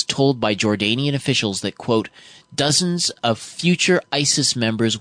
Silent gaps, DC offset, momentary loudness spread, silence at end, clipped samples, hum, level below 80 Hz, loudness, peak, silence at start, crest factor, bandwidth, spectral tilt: none; under 0.1%; 6 LU; 0 s; under 0.1%; none; -58 dBFS; -19 LUFS; -4 dBFS; 0 s; 16 dB; 10 kHz; -3.5 dB/octave